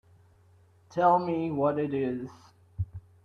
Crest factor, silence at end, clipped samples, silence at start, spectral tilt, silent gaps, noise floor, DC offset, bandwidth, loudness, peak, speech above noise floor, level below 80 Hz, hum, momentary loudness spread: 18 dB; 0.25 s; under 0.1%; 0.9 s; -8.5 dB/octave; none; -60 dBFS; under 0.1%; 7.6 kHz; -29 LUFS; -12 dBFS; 33 dB; -56 dBFS; none; 15 LU